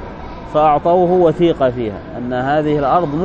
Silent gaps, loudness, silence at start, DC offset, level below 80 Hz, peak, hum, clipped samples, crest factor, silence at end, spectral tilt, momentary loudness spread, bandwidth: none; -15 LUFS; 0 s; under 0.1%; -38 dBFS; 0 dBFS; none; under 0.1%; 14 dB; 0 s; -8.5 dB/octave; 12 LU; 7.4 kHz